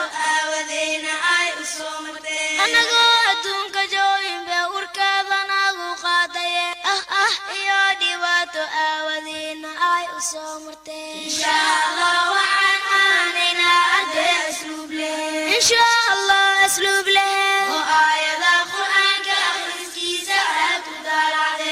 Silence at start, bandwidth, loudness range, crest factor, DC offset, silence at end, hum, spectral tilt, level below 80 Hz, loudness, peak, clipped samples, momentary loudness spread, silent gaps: 0 s; 16 kHz; 5 LU; 14 dB; under 0.1%; 0 s; none; 1 dB/octave; -62 dBFS; -18 LUFS; -6 dBFS; under 0.1%; 11 LU; none